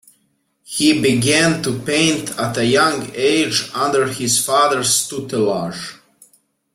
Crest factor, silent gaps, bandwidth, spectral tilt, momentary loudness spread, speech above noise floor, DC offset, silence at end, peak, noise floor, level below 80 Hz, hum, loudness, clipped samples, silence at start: 16 dB; none; 16.5 kHz; -3 dB/octave; 8 LU; 48 dB; under 0.1%; 0.8 s; -2 dBFS; -65 dBFS; -54 dBFS; none; -16 LUFS; under 0.1%; 0.7 s